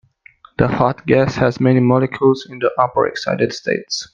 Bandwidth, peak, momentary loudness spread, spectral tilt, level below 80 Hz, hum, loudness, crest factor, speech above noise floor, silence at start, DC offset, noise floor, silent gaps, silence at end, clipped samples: 7.4 kHz; 0 dBFS; 6 LU; -6.5 dB/octave; -48 dBFS; none; -17 LUFS; 16 dB; 32 dB; 0.6 s; under 0.1%; -48 dBFS; none; 0.1 s; under 0.1%